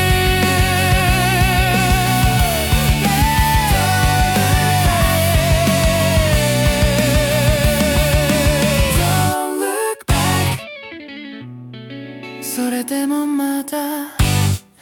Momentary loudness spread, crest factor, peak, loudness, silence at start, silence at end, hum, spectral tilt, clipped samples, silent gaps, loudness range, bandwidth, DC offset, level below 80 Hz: 15 LU; 12 dB; -4 dBFS; -16 LUFS; 0 s; 0.2 s; none; -4.5 dB/octave; under 0.1%; none; 7 LU; 19 kHz; under 0.1%; -24 dBFS